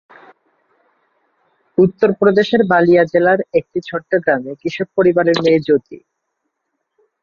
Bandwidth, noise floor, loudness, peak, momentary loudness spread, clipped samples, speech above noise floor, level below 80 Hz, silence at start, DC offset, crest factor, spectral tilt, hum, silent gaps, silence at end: 7 kHz; -74 dBFS; -15 LUFS; -2 dBFS; 10 LU; under 0.1%; 59 dB; -58 dBFS; 1.8 s; under 0.1%; 14 dB; -7 dB/octave; none; none; 1.25 s